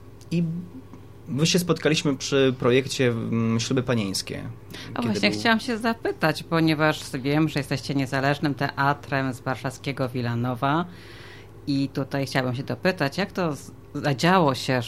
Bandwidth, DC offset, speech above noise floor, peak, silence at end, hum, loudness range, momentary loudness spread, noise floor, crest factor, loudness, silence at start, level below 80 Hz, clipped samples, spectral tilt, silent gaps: 15.5 kHz; 0.3%; 20 dB; -6 dBFS; 0 s; none; 4 LU; 14 LU; -44 dBFS; 18 dB; -24 LUFS; 0 s; -54 dBFS; under 0.1%; -5 dB/octave; none